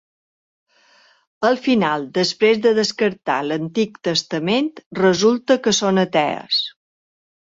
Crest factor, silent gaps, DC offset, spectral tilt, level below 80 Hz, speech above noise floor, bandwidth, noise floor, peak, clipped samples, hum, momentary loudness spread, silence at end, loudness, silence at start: 18 dB; 4.86-4.91 s; under 0.1%; -4 dB/octave; -62 dBFS; 36 dB; 7.8 kHz; -55 dBFS; -2 dBFS; under 0.1%; none; 6 LU; 0.7 s; -18 LUFS; 1.4 s